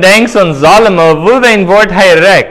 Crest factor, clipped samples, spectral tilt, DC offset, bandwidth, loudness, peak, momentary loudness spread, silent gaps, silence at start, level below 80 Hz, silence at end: 6 dB; 9%; -4.5 dB/octave; under 0.1%; 16 kHz; -5 LUFS; 0 dBFS; 2 LU; none; 0 s; -36 dBFS; 0 s